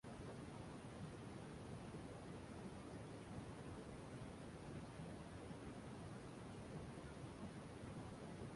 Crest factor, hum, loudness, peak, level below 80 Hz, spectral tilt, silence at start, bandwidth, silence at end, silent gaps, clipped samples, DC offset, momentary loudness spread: 14 dB; none; -55 LUFS; -40 dBFS; -66 dBFS; -6 dB/octave; 0.05 s; 11.5 kHz; 0 s; none; under 0.1%; under 0.1%; 1 LU